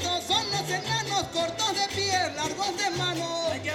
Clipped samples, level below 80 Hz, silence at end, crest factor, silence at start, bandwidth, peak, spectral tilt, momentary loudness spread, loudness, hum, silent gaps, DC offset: under 0.1%; -58 dBFS; 0 s; 16 dB; 0 s; 17 kHz; -12 dBFS; -2.5 dB/octave; 4 LU; -27 LUFS; none; none; under 0.1%